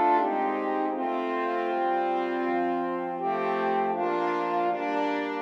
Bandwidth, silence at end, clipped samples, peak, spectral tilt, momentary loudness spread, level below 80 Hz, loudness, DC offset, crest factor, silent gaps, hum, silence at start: 7.2 kHz; 0 s; under 0.1%; -12 dBFS; -6.5 dB/octave; 2 LU; -88 dBFS; -27 LUFS; under 0.1%; 14 dB; none; none; 0 s